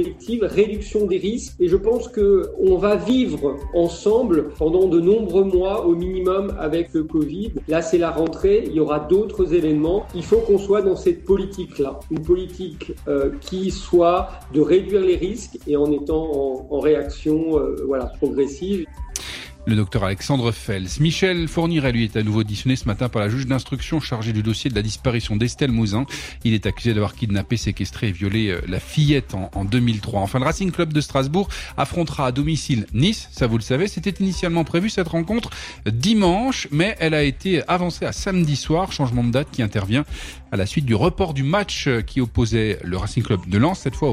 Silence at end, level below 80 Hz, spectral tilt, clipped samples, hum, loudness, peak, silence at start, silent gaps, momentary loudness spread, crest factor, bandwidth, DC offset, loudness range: 0 s; -36 dBFS; -6 dB/octave; under 0.1%; none; -21 LUFS; -4 dBFS; 0 s; none; 7 LU; 16 dB; 15 kHz; under 0.1%; 3 LU